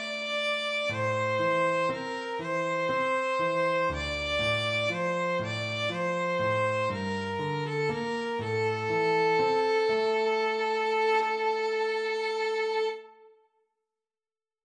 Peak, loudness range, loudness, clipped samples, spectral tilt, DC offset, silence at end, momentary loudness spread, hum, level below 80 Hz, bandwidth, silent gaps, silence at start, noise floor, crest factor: -16 dBFS; 3 LU; -28 LUFS; under 0.1%; -5 dB/octave; under 0.1%; 1.5 s; 6 LU; none; -56 dBFS; 10.5 kHz; none; 0 s; under -90 dBFS; 12 dB